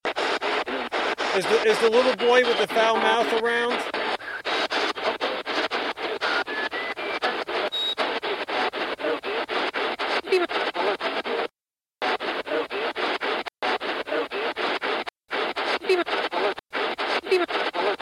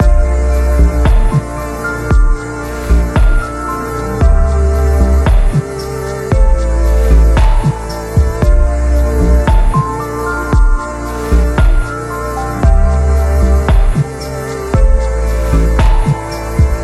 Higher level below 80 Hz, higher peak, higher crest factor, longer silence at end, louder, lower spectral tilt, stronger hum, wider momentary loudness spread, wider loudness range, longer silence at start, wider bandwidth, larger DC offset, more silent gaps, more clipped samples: second, -66 dBFS vs -12 dBFS; second, -6 dBFS vs 0 dBFS; first, 18 dB vs 10 dB; about the same, 0 s vs 0 s; second, -25 LUFS vs -14 LUFS; second, -2.5 dB/octave vs -7 dB/octave; neither; about the same, 8 LU vs 8 LU; first, 6 LU vs 2 LU; about the same, 0.05 s vs 0 s; first, 14.5 kHz vs 13 kHz; neither; neither; neither